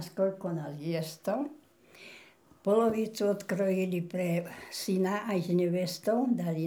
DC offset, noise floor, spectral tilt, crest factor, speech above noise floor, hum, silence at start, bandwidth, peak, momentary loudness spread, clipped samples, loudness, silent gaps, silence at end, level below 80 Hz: under 0.1%; -57 dBFS; -6.5 dB/octave; 16 dB; 27 dB; none; 0 s; 20 kHz; -14 dBFS; 9 LU; under 0.1%; -31 LUFS; none; 0 s; -76 dBFS